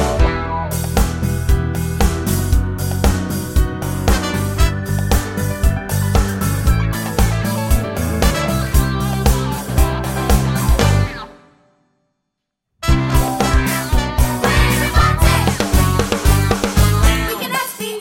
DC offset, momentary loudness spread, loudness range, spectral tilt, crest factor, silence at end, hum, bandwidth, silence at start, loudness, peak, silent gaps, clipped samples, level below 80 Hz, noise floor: under 0.1%; 6 LU; 4 LU; -5 dB/octave; 16 dB; 0 s; none; 17 kHz; 0 s; -17 LUFS; 0 dBFS; none; under 0.1%; -20 dBFS; -77 dBFS